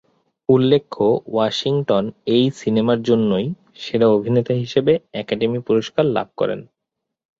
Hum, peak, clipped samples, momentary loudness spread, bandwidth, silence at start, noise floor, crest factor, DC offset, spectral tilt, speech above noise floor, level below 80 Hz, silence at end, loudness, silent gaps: none; -2 dBFS; under 0.1%; 7 LU; 7.6 kHz; 0.5 s; -81 dBFS; 16 dB; under 0.1%; -7 dB/octave; 63 dB; -58 dBFS; 0.75 s; -19 LUFS; none